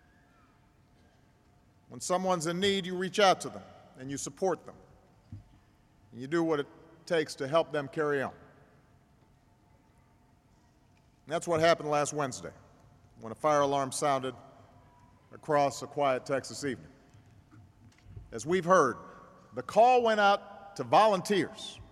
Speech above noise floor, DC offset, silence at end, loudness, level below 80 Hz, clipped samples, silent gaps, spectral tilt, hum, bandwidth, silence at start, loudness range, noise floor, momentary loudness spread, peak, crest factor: 35 dB; under 0.1%; 0.1 s; -29 LUFS; -66 dBFS; under 0.1%; none; -4 dB/octave; none; 14.5 kHz; 1.9 s; 8 LU; -64 dBFS; 19 LU; -8 dBFS; 22 dB